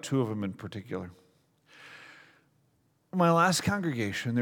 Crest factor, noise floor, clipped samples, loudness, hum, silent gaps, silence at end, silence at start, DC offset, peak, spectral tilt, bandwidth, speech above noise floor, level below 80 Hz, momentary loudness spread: 20 dB; -70 dBFS; under 0.1%; -29 LUFS; none; none; 0 s; 0.05 s; under 0.1%; -10 dBFS; -5 dB/octave; 18.5 kHz; 42 dB; -64 dBFS; 25 LU